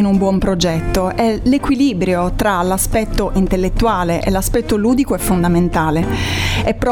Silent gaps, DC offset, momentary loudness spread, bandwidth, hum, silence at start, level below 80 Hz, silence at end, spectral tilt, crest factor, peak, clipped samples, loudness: none; under 0.1%; 3 LU; 19 kHz; none; 0 s; -24 dBFS; 0 s; -5.5 dB/octave; 14 dB; 0 dBFS; under 0.1%; -16 LUFS